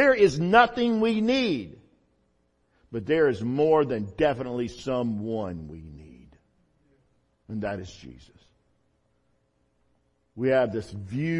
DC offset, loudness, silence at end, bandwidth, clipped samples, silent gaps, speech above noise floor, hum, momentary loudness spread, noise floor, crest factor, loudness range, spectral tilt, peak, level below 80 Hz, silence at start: under 0.1%; -25 LUFS; 0 s; 10.5 kHz; under 0.1%; none; 45 dB; none; 19 LU; -70 dBFS; 22 dB; 16 LU; -6.5 dB/octave; -4 dBFS; -56 dBFS; 0 s